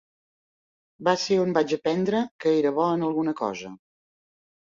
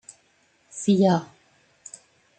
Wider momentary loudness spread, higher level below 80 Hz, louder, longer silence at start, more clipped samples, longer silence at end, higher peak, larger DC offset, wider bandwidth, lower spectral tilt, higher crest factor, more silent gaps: second, 8 LU vs 24 LU; about the same, -68 dBFS vs -70 dBFS; about the same, -24 LUFS vs -22 LUFS; first, 1 s vs 0.75 s; neither; second, 0.95 s vs 1.15 s; about the same, -8 dBFS vs -8 dBFS; neither; second, 7.6 kHz vs 9.2 kHz; about the same, -5.5 dB/octave vs -6.5 dB/octave; about the same, 18 dB vs 20 dB; first, 2.31-2.39 s vs none